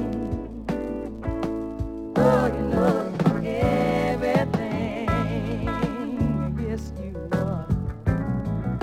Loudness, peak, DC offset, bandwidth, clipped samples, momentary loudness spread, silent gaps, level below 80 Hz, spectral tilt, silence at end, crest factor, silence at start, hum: -25 LUFS; -6 dBFS; under 0.1%; 15 kHz; under 0.1%; 9 LU; none; -36 dBFS; -8 dB/octave; 0 s; 18 dB; 0 s; none